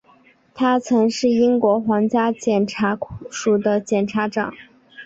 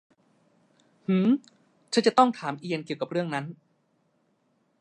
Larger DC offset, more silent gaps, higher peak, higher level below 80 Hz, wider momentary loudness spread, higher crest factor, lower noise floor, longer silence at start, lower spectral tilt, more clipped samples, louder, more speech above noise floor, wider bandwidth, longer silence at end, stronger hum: neither; neither; about the same, -4 dBFS vs -4 dBFS; first, -56 dBFS vs -78 dBFS; second, 8 LU vs 12 LU; second, 16 dB vs 24 dB; second, -54 dBFS vs -70 dBFS; second, 0.55 s vs 1.1 s; about the same, -5.5 dB/octave vs -6 dB/octave; neither; first, -19 LUFS vs -26 LUFS; second, 35 dB vs 45 dB; second, 8 kHz vs 10.5 kHz; second, 0 s vs 1.25 s; neither